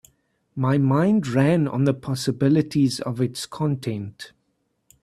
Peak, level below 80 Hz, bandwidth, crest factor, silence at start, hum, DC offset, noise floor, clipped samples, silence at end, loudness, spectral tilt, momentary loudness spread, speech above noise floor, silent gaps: -6 dBFS; -60 dBFS; 13 kHz; 16 dB; 0.55 s; none; under 0.1%; -72 dBFS; under 0.1%; 0.75 s; -22 LUFS; -7 dB/octave; 13 LU; 50 dB; none